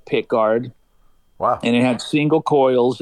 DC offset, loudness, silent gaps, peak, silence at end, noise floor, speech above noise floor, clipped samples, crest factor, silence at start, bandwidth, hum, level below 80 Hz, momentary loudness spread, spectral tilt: under 0.1%; -18 LUFS; none; -6 dBFS; 0 s; -54 dBFS; 37 dB; under 0.1%; 12 dB; 0.1 s; 11.5 kHz; none; -58 dBFS; 7 LU; -6.5 dB/octave